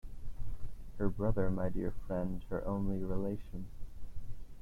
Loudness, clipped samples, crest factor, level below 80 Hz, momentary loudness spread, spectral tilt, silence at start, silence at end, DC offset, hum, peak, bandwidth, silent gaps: -38 LUFS; under 0.1%; 16 dB; -44 dBFS; 17 LU; -9.5 dB/octave; 0.05 s; 0 s; under 0.1%; none; -18 dBFS; 3.5 kHz; none